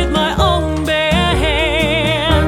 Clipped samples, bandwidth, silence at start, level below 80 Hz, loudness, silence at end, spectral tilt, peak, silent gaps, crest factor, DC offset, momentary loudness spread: under 0.1%; 16 kHz; 0 s; -22 dBFS; -14 LUFS; 0 s; -5 dB/octave; 0 dBFS; none; 14 dB; under 0.1%; 2 LU